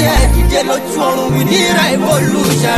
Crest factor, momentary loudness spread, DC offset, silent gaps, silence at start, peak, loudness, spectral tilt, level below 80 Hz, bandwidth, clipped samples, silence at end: 10 dB; 4 LU; under 0.1%; none; 0 s; -2 dBFS; -12 LUFS; -4.5 dB/octave; -18 dBFS; 14 kHz; under 0.1%; 0 s